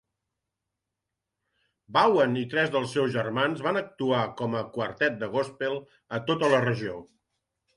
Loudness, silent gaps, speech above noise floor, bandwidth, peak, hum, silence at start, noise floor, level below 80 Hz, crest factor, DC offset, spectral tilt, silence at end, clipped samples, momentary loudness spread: -27 LUFS; none; 59 dB; 11.5 kHz; -8 dBFS; none; 1.9 s; -86 dBFS; -68 dBFS; 20 dB; under 0.1%; -6 dB/octave; 0.7 s; under 0.1%; 10 LU